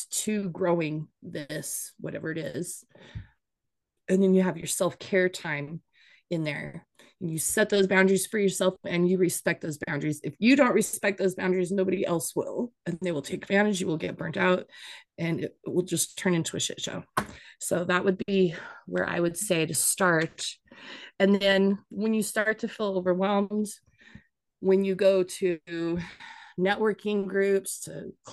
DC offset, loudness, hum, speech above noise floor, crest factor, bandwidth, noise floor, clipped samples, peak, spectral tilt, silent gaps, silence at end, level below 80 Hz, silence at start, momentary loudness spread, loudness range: under 0.1%; -27 LUFS; none; 57 dB; 20 dB; 12.5 kHz; -85 dBFS; under 0.1%; -8 dBFS; -4.5 dB/octave; none; 0 s; -64 dBFS; 0 s; 16 LU; 4 LU